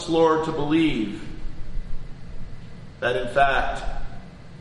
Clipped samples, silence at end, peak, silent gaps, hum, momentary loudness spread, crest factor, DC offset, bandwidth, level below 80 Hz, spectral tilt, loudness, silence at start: under 0.1%; 0 s; -4 dBFS; none; none; 22 LU; 20 dB; under 0.1%; 11 kHz; -34 dBFS; -6 dB/octave; -23 LUFS; 0 s